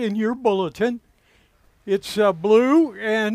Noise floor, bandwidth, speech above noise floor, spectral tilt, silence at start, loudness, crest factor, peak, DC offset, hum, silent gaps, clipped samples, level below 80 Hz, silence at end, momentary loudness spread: -59 dBFS; 15 kHz; 39 dB; -6 dB/octave; 0 s; -20 LUFS; 16 dB; -6 dBFS; under 0.1%; none; none; under 0.1%; -60 dBFS; 0 s; 10 LU